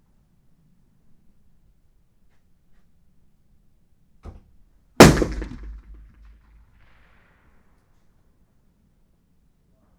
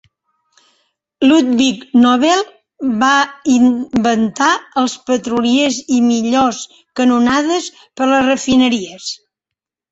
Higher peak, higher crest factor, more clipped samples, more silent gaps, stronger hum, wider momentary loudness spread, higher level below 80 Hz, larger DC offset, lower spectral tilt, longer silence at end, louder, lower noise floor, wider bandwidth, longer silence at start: about the same, 0 dBFS vs -2 dBFS; first, 26 dB vs 14 dB; neither; neither; neither; first, 31 LU vs 11 LU; first, -38 dBFS vs -52 dBFS; neither; first, -5 dB/octave vs -3.5 dB/octave; first, 4.25 s vs 0.75 s; about the same, -15 LUFS vs -14 LUFS; second, -61 dBFS vs -83 dBFS; first, over 20 kHz vs 8 kHz; first, 5 s vs 1.2 s